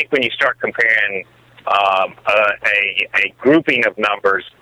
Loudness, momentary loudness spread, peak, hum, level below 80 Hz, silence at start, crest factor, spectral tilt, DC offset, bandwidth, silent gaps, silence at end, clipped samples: -15 LUFS; 5 LU; -2 dBFS; none; -60 dBFS; 0 s; 14 dB; -4.5 dB/octave; under 0.1%; 13 kHz; none; 0.1 s; under 0.1%